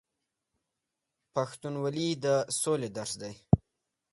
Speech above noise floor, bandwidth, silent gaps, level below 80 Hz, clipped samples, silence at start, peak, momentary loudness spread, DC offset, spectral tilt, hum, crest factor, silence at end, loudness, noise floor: 54 dB; 12 kHz; none; -52 dBFS; under 0.1%; 1.35 s; -6 dBFS; 8 LU; under 0.1%; -5 dB/octave; none; 26 dB; 0.55 s; -31 LUFS; -86 dBFS